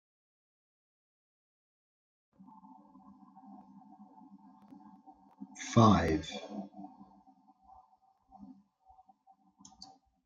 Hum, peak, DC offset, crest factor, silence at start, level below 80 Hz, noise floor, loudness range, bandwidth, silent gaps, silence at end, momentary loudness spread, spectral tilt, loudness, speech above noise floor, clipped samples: none; -10 dBFS; under 0.1%; 28 dB; 5.4 s; -62 dBFS; -69 dBFS; 20 LU; 7.8 kHz; none; 1.8 s; 31 LU; -6.5 dB/octave; -30 LUFS; 41 dB; under 0.1%